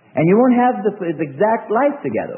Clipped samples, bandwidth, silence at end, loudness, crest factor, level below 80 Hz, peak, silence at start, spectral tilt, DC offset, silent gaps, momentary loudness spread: under 0.1%; 3.2 kHz; 0 s; -17 LUFS; 14 dB; -64 dBFS; -4 dBFS; 0.15 s; -13 dB/octave; under 0.1%; none; 10 LU